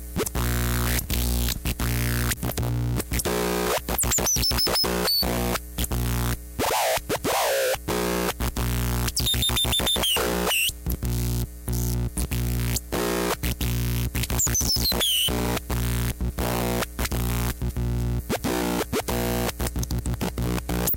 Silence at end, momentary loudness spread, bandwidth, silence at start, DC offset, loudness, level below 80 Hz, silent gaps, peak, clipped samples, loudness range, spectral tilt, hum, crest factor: 0 s; 7 LU; 17.5 kHz; 0 s; under 0.1%; -24 LUFS; -32 dBFS; none; -12 dBFS; under 0.1%; 4 LU; -3.5 dB/octave; 60 Hz at -35 dBFS; 14 dB